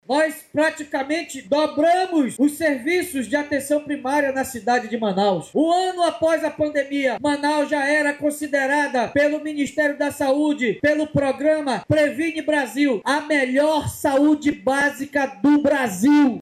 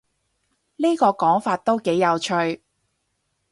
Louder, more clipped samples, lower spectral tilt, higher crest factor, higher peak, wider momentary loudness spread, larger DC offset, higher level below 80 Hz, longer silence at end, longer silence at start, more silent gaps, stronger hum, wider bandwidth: about the same, -20 LUFS vs -21 LUFS; neither; about the same, -4.5 dB/octave vs -5 dB/octave; second, 12 dB vs 18 dB; about the same, -8 dBFS vs -6 dBFS; about the same, 6 LU vs 6 LU; neither; first, -56 dBFS vs -66 dBFS; second, 0 s vs 0.95 s; second, 0.1 s vs 0.8 s; neither; neither; first, 14.5 kHz vs 11.5 kHz